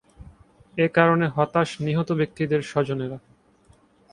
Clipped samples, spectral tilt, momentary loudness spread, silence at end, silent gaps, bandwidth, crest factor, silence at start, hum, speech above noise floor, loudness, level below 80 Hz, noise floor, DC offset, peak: under 0.1%; -7 dB/octave; 12 LU; 0.95 s; none; 10.5 kHz; 22 dB; 0.2 s; none; 35 dB; -23 LUFS; -56 dBFS; -58 dBFS; under 0.1%; -4 dBFS